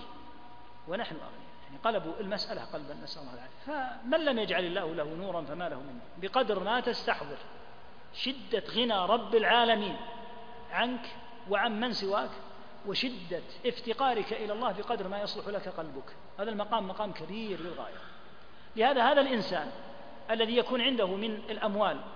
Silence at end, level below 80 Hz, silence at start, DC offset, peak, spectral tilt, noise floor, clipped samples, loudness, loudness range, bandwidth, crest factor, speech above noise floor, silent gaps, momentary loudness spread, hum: 0 s; -64 dBFS; 0 s; 0.6%; -10 dBFS; -5.5 dB/octave; -54 dBFS; under 0.1%; -32 LUFS; 7 LU; 5.2 kHz; 22 dB; 22 dB; none; 20 LU; none